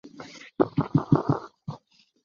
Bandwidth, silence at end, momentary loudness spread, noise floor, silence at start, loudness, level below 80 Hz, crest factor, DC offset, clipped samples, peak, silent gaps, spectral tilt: 7.2 kHz; 0.5 s; 20 LU; -55 dBFS; 0.05 s; -26 LUFS; -56 dBFS; 22 dB; under 0.1%; under 0.1%; -6 dBFS; none; -9 dB/octave